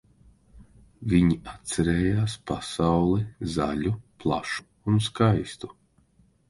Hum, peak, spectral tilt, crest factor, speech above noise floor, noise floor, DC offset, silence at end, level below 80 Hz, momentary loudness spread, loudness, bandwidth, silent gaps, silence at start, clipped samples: none; -8 dBFS; -6.5 dB/octave; 18 dB; 38 dB; -62 dBFS; under 0.1%; 0.8 s; -44 dBFS; 10 LU; -26 LUFS; 11.5 kHz; none; 0.55 s; under 0.1%